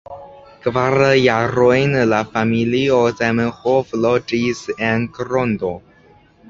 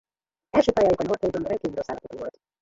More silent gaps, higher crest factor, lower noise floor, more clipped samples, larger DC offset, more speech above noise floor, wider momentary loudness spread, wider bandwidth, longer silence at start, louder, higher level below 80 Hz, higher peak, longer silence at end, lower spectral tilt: neither; about the same, 16 dB vs 20 dB; second, -50 dBFS vs -58 dBFS; neither; neither; about the same, 33 dB vs 34 dB; second, 9 LU vs 16 LU; about the same, 7.6 kHz vs 7.8 kHz; second, 0.1 s vs 0.55 s; first, -17 LUFS vs -24 LUFS; about the same, -48 dBFS vs -52 dBFS; first, -2 dBFS vs -6 dBFS; first, 0.7 s vs 0.3 s; about the same, -6.5 dB/octave vs -6.5 dB/octave